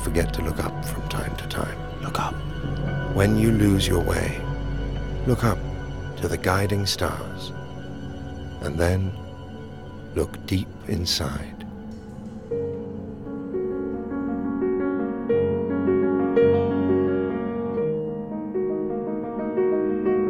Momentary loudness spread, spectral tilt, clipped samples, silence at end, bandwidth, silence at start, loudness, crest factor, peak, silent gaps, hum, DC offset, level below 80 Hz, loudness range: 14 LU; -6 dB/octave; under 0.1%; 0 s; 17.5 kHz; 0 s; -25 LUFS; 20 dB; -4 dBFS; none; none; under 0.1%; -36 dBFS; 7 LU